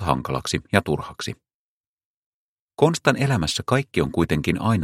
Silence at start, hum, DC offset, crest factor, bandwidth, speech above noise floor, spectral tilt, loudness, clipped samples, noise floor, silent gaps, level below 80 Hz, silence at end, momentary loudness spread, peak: 0 s; none; under 0.1%; 22 dB; 15.5 kHz; over 68 dB; -5.5 dB/octave; -22 LUFS; under 0.1%; under -90 dBFS; 1.54-1.97 s, 2.05-2.68 s; -44 dBFS; 0 s; 11 LU; 0 dBFS